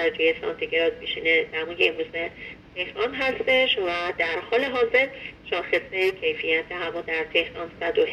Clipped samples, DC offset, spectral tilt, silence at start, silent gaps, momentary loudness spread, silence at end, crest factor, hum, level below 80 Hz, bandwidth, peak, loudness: under 0.1%; under 0.1%; -4.5 dB/octave; 0 s; none; 9 LU; 0 s; 18 dB; none; -56 dBFS; 12 kHz; -6 dBFS; -24 LUFS